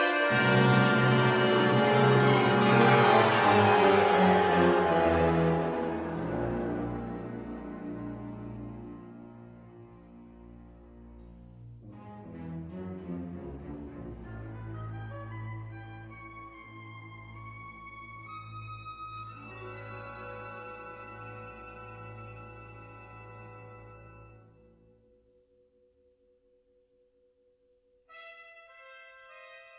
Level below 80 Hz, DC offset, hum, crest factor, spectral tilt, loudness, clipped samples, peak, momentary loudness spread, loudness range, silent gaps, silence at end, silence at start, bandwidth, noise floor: -54 dBFS; under 0.1%; none; 22 dB; -4.5 dB/octave; -25 LUFS; under 0.1%; -8 dBFS; 26 LU; 25 LU; none; 0.2 s; 0 s; 4 kHz; -68 dBFS